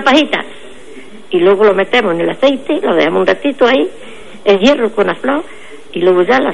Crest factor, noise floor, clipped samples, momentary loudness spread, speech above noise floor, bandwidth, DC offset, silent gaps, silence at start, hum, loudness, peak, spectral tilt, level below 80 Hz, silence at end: 12 dB; -35 dBFS; under 0.1%; 10 LU; 24 dB; 11 kHz; 3%; none; 0 s; none; -12 LUFS; 0 dBFS; -5 dB/octave; -50 dBFS; 0 s